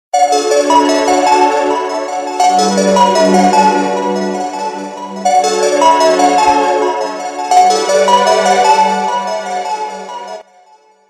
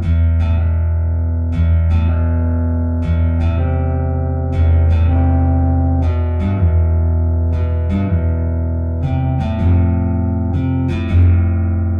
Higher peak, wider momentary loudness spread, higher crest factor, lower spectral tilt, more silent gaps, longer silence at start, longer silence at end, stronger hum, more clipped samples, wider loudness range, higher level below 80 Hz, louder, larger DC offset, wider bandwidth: first, 0 dBFS vs -4 dBFS; first, 11 LU vs 4 LU; about the same, 12 dB vs 10 dB; second, -3.5 dB/octave vs -10.5 dB/octave; neither; first, 0.15 s vs 0 s; first, 0.65 s vs 0 s; neither; neither; about the same, 2 LU vs 2 LU; second, -54 dBFS vs -20 dBFS; first, -11 LUFS vs -16 LUFS; neither; first, 14.5 kHz vs 3.8 kHz